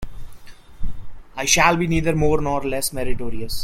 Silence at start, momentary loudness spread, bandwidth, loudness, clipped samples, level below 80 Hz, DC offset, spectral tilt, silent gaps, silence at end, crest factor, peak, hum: 0 s; 22 LU; 15.5 kHz; -20 LUFS; under 0.1%; -32 dBFS; under 0.1%; -3.5 dB/octave; none; 0 s; 18 dB; -2 dBFS; none